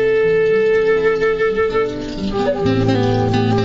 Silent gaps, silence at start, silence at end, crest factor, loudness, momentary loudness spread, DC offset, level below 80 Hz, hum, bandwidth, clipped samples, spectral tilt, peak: none; 0 s; 0 s; 12 dB; -16 LUFS; 5 LU; under 0.1%; -36 dBFS; none; 7.6 kHz; under 0.1%; -7 dB/octave; -4 dBFS